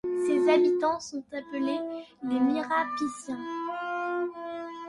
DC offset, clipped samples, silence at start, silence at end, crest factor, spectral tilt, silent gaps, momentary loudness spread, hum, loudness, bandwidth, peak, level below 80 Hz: under 0.1%; under 0.1%; 0.05 s; 0 s; 18 dB; -4 dB/octave; none; 14 LU; none; -29 LUFS; 11.5 kHz; -12 dBFS; -72 dBFS